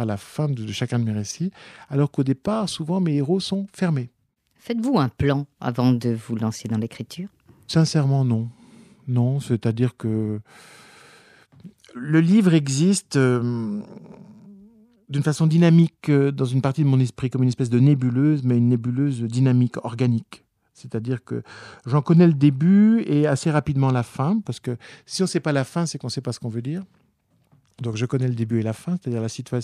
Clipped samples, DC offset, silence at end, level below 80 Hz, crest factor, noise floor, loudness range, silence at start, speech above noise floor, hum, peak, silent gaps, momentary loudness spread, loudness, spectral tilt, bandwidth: under 0.1%; under 0.1%; 0 s; -56 dBFS; 16 dB; -64 dBFS; 7 LU; 0 s; 44 dB; none; -4 dBFS; none; 14 LU; -22 LUFS; -7 dB/octave; 12.5 kHz